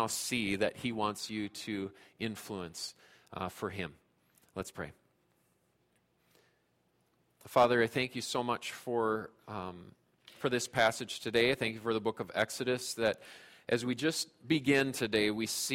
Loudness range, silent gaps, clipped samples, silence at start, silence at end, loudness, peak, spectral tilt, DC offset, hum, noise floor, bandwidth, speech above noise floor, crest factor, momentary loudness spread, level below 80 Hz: 12 LU; none; under 0.1%; 0 s; 0 s; -34 LUFS; -14 dBFS; -3.5 dB/octave; under 0.1%; none; -74 dBFS; 16.5 kHz; 41 dB; 20 dB; 15 LU; -68 dBFS